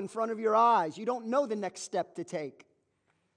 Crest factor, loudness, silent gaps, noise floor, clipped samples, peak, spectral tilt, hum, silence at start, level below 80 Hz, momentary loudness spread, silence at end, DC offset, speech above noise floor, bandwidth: 16 dB; -30 LUFS; none; -75 dBFS; under 0.1%; -14 dBFS; -4.5 dB/octave; none; 0 s; -90 dBFS; 14 LU; 0.85 s; under 0.1%; 45 dB; 10 kHz